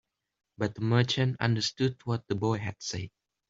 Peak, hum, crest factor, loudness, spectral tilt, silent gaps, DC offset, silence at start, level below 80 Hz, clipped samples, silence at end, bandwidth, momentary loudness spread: -10 dBFS; none; 20 dB; -30 LUFS; -5.5 dB/octave; none; under 0.1%; 0.6 s; -62 dBFS; under 0.1%; 0.4 s; 7.8 kHz; 10 LU